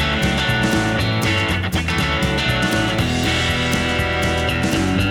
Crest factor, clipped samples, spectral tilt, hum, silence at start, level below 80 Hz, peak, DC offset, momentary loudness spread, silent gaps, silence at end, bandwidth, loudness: 14 dB; under 0.1%; -4.5 dB/octave; none; 0 s; -30 dBFS; -4 dBFS; under 0.1%; 1 LU; none; 0 s; over 20 kHz; -18 LUFS